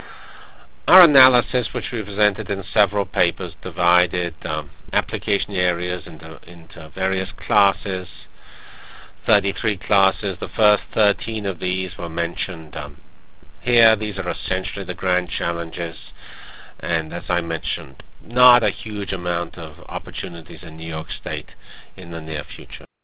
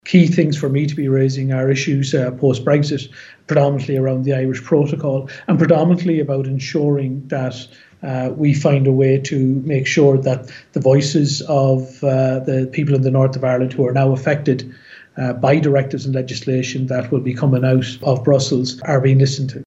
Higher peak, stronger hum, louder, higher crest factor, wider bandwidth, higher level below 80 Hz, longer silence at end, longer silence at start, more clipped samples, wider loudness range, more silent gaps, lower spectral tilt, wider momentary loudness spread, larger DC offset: about the same, 0 dBFS vs 0 dBFS; neither; second, -21 LUFS vs -17 LUFS; first, 22 dB vs 16 dB; second, 4 kHz vs 8 kHz; first, -42 dBFS vs -60 dBFS; about the same, 0 s vs 0.1 s; about the same, 0 s vs 0.05 s; neither; first, 7 LU vs 2 LU; neither; first, -8.5 dB/octave vs -7 dB/octave; first, 20 LU vs 9 LU; first, 2% vs under 0.1%